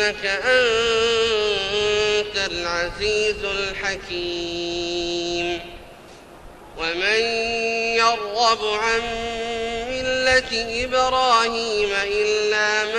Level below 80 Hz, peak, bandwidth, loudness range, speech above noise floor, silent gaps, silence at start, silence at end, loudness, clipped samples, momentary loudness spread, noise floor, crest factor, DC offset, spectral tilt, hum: -44 dBFS; -6 dBFS; 10.5 kHz; 5 LU; 22 dB; none; 0 s; 0 s; -21 LUFS; under 0.1%; 8 LU; -43 dBFS; 16 dB; under 0.1%; -2 dB/octave; none